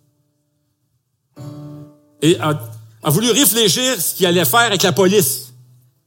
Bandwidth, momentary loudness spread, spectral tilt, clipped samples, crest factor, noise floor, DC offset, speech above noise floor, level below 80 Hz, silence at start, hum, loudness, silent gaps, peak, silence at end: 17 kHz; 22 LU; -3.5 dB/octave; under 0.1%; 18 dB; -67 dBFS; under 0.1%; 52 dB; -62 dBFS; 1.4 s; none; -14 LUFS; none; 0 dBFS; 0.6 s